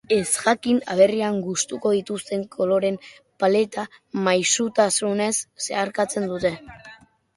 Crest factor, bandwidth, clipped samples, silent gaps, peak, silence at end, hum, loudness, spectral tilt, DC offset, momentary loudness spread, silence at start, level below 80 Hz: 20 dB; 11.5 kHz; under 0.1%; none; -4 dBFS; 0.4 s; none; -22 LUFS; -3.5 dB/octave; under 0.1%; 9 LU; 0.1 s; -60 dBFS